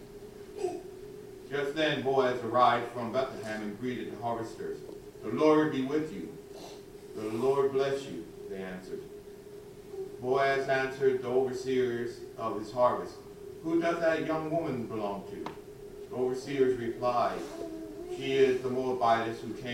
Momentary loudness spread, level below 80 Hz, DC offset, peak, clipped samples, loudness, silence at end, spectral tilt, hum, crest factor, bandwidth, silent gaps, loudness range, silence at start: 19 LU; -62 dBFS; under 0.1%; -10 dBFS; under 0.1%; -31 LUFS; 0 s; -5.5 dB/octave; none; 20 dB; 16 kHz; none; 4 LU; 0 s